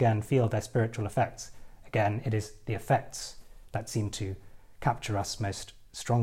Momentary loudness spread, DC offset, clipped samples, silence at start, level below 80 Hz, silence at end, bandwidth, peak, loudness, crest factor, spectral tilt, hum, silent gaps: 13 LU; under 0.1%; under 0.1%; 0 s; -52 dBFS; 0 s; 15.5 kHz; -12 dBFS; -31 LUFS; 18 dB; -6 dB/octave; none; none